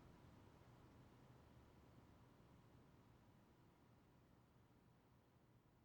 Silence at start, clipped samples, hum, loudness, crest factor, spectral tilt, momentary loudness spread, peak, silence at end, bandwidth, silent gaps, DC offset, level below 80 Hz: 0 s; under 0.1%; none; -69 LUFS; 16 dB; -6.5 dB/octave; 2 LU; -54 dBFS; 0 s; 19 kHz; none; under 0.1%; -78 dBFS